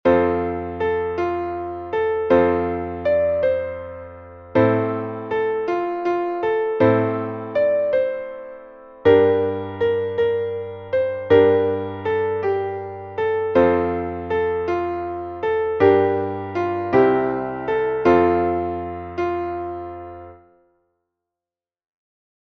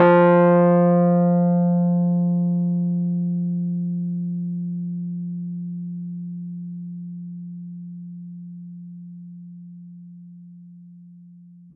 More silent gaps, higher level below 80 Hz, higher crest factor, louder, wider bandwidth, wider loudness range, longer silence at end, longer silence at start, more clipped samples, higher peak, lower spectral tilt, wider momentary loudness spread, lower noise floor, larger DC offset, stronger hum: neither; first, -50 dBFS vs -74 dBFS; about the same, 18 dB vs 18 dB; about the same, -21 LUFS vs -21 LUFS; first, 6.2 kHz vs 3.5 kHz; second, 3 LU vs 20 LU; first, 2.15 s vs 0.45 s; about the same, 0.05 s vs 0 s; neither; about the same, -2 dBFS vs -4 dBFS; second, -8.5 dB/octave vs -13 dB/octave; second, 13 LU vs 24 LU; first, under -90 dBFS vs -46 dBFS; neither; neither